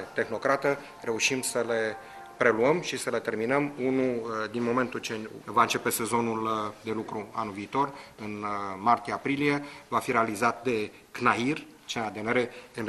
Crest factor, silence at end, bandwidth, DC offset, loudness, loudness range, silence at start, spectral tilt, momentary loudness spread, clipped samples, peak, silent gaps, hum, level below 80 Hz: 22 dB; 0 s; 13 kHz; under 0.1%; -28 LUFS; 3 LU; 0 s; -4 dB/octave; 9 LU; under 0.1%; -8 dBFS; none; none; -66 dBFS